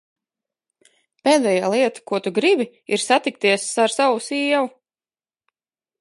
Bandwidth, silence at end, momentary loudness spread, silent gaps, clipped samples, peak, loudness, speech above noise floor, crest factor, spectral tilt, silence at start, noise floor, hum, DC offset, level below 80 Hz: 11.5 kHz; 1.3 s; 6 LU; none; under 0.1%; -2 dBFS; -19 LUFS; over 71 dB; 20 dB; -3 dB/octave; 1.25 s; under -90 dBFS; none; under 0.1%; -78 dBFS